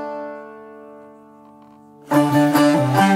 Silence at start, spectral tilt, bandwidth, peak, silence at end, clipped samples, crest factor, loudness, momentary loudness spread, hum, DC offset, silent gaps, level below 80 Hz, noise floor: 0 s; -6 dB/octave; 16 kHz; -4 dBFS; 0 s; under 0.1%; 16 dB; -16 LUFS; 24 LU; none; under 0.1%; none; -62 dBFS; -46 dBFS